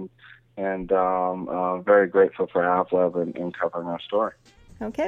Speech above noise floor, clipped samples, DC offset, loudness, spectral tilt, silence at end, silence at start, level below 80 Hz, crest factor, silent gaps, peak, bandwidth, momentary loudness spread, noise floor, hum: 29 dB; under 0.1%; under 0.1%; -24 LUFS; -7.5 dB/octave; 0 s; 0 s; -56 dBFS; 18 dB; none; -6 dBFS; 6.4 kHz; 12 LU; -52 dBFS; none